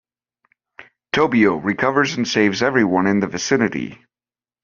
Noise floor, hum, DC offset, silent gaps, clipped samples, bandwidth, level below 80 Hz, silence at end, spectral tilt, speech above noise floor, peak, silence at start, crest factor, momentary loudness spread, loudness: under -90 dBFS; none; under 0.1%; none; under 0.1%; 7.2 kHz; -58 dBFS; 0.7 s; -4 dB/octave; over 72 dB; -2 dBFS; 0.8 s; 18 dB; 6 LU; -18 LUFS